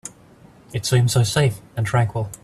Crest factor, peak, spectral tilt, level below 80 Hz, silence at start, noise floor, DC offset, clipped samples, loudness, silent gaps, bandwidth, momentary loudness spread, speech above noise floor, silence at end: 16 dB; -6 dBFS; -5 dB/octave; -48 dBFS; 0.05 s; -48 dBFS; under 0.1%; under 0.1%; -20 LUFS; none; 14 kHz; 11 LU; 29 dB; 0.05 s